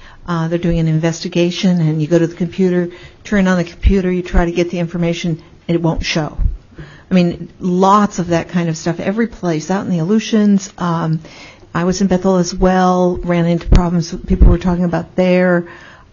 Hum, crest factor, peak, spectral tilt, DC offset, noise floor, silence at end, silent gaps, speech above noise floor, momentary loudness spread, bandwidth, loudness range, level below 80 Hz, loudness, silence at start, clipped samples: none; 14 dB; -2 dBFS; -6.5 dB/octave; under 0.1%; -36 dBFS; 0.25 s; none; 22 dB; 8 LU; 7.2 kHz; 3 LU; -22 dBFS; -16 LUFS; 0.05 s; under 0.1%